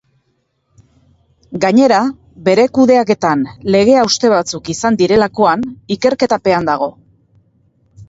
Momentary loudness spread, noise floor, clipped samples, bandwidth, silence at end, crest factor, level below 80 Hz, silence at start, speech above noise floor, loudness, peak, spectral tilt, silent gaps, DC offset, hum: 9 LU; -64 dBFS; under 0.1%; 8 kHz; 0.05 s; 14 dB; -50 dBFS; 1.5 s; 52 dB; -13 LUFS; 0 dBFS; -5 dB/octave; none; under 0.1%; none